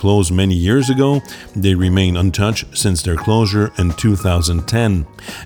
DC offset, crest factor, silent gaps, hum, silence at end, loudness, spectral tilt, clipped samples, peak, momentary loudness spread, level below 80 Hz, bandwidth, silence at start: under 0.1%; 14 dB; none; none; 0 s; -16 LUFS; -5.5 dB/octave; under 0.1%; -2 dBFS; 4 LU; -30 dBFS; 18.5 kHz; 0 s